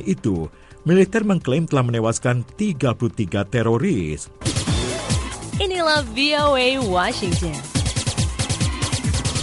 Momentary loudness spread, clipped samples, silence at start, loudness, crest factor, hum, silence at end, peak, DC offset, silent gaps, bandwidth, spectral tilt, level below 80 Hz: 7 LU; under 0.1%; 0 s; -21 LUFS; 16 dB; none; 0 s; -4 dBFS; under 0.1%; none; 11.5 kHz; -5 dB/octave; -34 dBFS